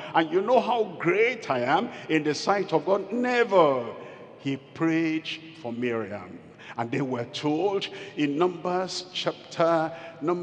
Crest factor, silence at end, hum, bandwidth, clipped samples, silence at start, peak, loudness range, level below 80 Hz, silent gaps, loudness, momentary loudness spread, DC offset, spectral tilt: 20 dB; 0 s; none; 9.4 kHz; under 0.1%; 0 s; -6 dBFS; 6 LU; -80 dBFS; none; -26 LUFS; 13 LU; under 0.1%; -5.5 dB/octave